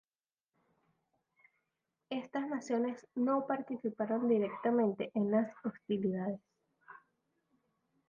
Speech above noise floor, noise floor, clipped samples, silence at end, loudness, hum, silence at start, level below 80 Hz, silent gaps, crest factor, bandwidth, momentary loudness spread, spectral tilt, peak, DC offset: over 56 dB; under -90 dBFS; under 0.1%; 1.15 s; -35 LUFS; none; 2.1 s; -84 dBFS; none; 18 dB; 7 kHz; 9 LU; -6.5 dB/octave; -20 dBFS; under 0.1%